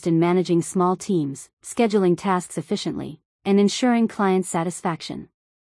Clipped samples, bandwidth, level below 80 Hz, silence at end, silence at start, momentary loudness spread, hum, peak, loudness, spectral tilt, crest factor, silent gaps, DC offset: under 0.1%; 12 kHz; -64 dBFS; 0.45 s; 0 s; 12 LU; none; -8 dBFS; -22 LUFS; -6 dB/octave; 14 dB; 1.53-1.57 s, 3.25-3.39 s; under 0.1%